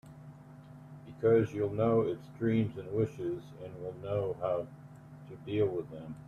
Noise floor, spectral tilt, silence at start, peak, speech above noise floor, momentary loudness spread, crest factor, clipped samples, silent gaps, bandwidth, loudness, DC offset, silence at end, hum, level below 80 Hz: -52 dBFS; -9 dB/octave; 0.05 s; -16 dBFS; 19 dB; 23 LU; 18 dB; under 0.1%; none; 7.2 kHz; -33 LUFS; under 0.1%; 0 s; none; -64 dBFS